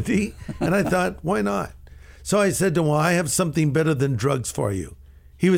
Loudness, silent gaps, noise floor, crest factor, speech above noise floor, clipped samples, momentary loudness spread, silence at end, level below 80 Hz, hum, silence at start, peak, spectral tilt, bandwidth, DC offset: -22 LUFS; none; -44 dBFS; 16 dB; 22 dB; under 0.1%; 9 LU; 0 s; -44 dBFS; none; 0 s; -6 dBFS; -5.5 dB/octave; 16.5 kHz; under 0.1%